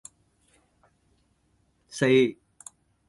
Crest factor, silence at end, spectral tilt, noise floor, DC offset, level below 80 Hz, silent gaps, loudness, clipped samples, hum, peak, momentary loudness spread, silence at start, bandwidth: 20 dB; 0.75 s; -5.5 dB/octave; -68 dBFS; under 0.1%; -68 dBFS; none; -23 LUFS; under 0.1%; none; -10 dBFS; 26 LU; 1.95 s; 11.5 kHz